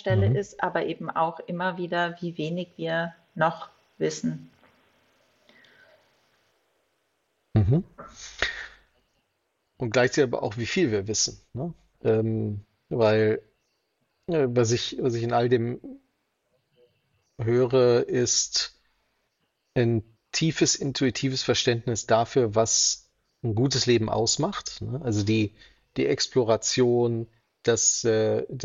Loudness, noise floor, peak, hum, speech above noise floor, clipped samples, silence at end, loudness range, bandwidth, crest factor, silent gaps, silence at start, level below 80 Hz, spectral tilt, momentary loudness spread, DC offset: -25 LUFS; -75 dBFS; -6 dBFS; none; 51 dB; under 0.1%; 0 s; 8 LU; 7.8 kHz; 20 dB; none; 0.05 s; -54 dBFS; -4 dB/octave; 12 LU; under 0.1%